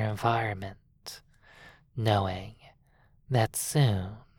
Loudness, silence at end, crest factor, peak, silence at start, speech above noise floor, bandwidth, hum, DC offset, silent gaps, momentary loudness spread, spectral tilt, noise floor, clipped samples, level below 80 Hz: -29 LUFS; 0.2 s; 20 dB; -10 dBFS; 0 s; 35 dB; 19 kHz; none; under 0.1%; none; 18 LU; -5 dB/octave; -63 dBFS; under 0.1%; -56 dBFS